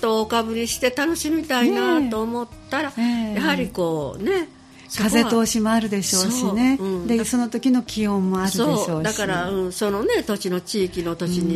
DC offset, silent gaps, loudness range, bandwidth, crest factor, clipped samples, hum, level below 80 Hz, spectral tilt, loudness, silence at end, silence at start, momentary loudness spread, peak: under 0.1%; none; 2 LU; 15 kHz; 16 dB; under 0.1%; none; -48 dBFS; -4 dB/octave; -21 LUFS; 0 s; 0 s; 6 LU; -4 dBFS